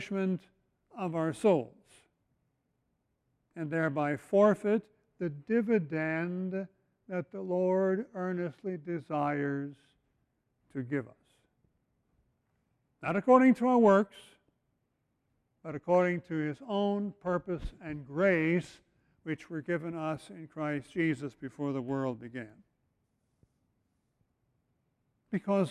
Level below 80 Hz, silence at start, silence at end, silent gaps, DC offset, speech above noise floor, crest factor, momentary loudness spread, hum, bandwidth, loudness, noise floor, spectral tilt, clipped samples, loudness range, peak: -62 dBFS; 0 s; 0 s; none; under 0.1%; 49 dB; 22 dB; 17 LU; none; 11.5 kHz; -31 LUFS; -79 dBFS; -8 dB/octave; under 0.1%; 12 LU; -10 dBFS